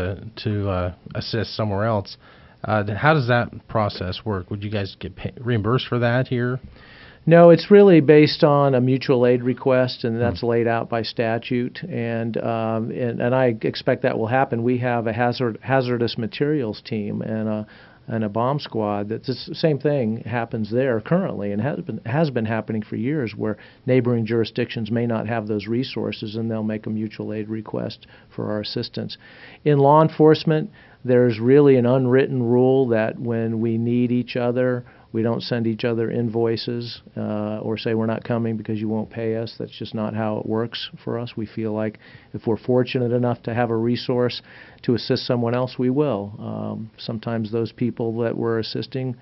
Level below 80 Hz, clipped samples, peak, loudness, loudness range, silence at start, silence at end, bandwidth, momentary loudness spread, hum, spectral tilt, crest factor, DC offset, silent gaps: -56 dBFS; under 0.1%; 0 dBFS; -21 LUFS; 9 LU; 0 s; 0.05 s; 6 kHz; 13 LU; none; -6 dB/octave; 20 dB; under 0.1%; none